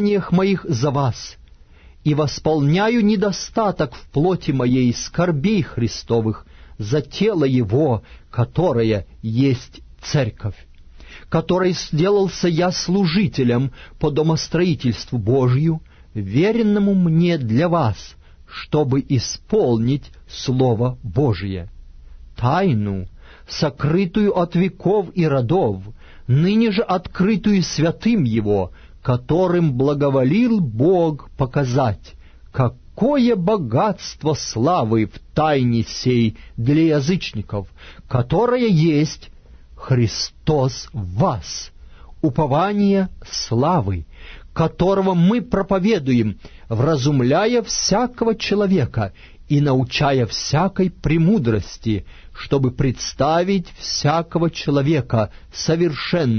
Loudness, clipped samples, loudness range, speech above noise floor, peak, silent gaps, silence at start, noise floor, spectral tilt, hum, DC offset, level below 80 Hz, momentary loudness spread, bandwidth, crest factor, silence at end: -19 LUFS; under 0.1%; 3 LU; 27 dB; -4 dBFS; none; 0 s; -45 dBFS; -6.5 dB/octave; none; under 0.1%; -40 dBFS; 9 LU; 6.6 kHz; 14 dB; 0 s